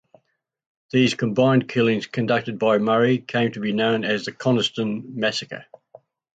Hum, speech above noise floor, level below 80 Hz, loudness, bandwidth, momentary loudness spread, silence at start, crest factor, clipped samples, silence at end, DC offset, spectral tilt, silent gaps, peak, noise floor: none; 50 dB; -64 dBFS; -21 LUFS; 9 kHz; 6 LU; 0.95 s; 16 dB; under 0.1%; 0.75 s; under 0.1%; -6 dB/octave; none; -6 dBFS; -71 dBFS